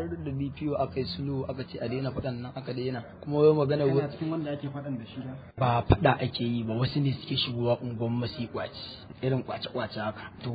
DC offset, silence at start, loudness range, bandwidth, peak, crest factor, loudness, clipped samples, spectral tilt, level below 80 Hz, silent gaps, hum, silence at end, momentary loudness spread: under 0.1%; 0 s; 4 LU; 5 kHz; -6 dBFS; 24 dB; -30 LUFS; under 0.1%; -10 dB/octave; -50 dBFS; none; none; 0 s; 13 LU